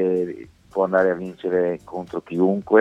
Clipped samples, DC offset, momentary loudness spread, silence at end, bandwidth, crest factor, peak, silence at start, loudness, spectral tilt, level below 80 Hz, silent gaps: under 0.1%; under 0.1%; 12 LU; 0 s; 7.8 kHz; 20 dB; -2 dBFS; 0 s; -23 LUFS; -8.5 dB/octave; -58 dBFS; none